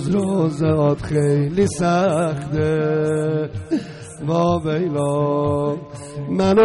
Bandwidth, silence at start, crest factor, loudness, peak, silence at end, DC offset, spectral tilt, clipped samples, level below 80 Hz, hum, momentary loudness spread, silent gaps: 11.5 kHz; 0 s; 12 dB; -20 LUFS; -6 dBFS; 0 s; under 0.1%; -7 dB/octave; under 0.1%; -46 dBFS; none; 8 LU; none